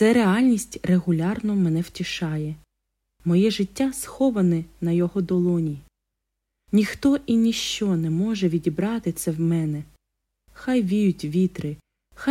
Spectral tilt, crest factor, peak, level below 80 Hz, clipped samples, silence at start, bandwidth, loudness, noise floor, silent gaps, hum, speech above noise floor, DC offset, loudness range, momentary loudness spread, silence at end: -6 dB/octave; 16 dB; -6 dBFS; -54 dBFS; under 0.1%; 0 s; 15.5 kHz; -23 LUFS; -81 dBFS; none; none; 59 dB; under 0.1%; 2 LU; 9 LU; 0 s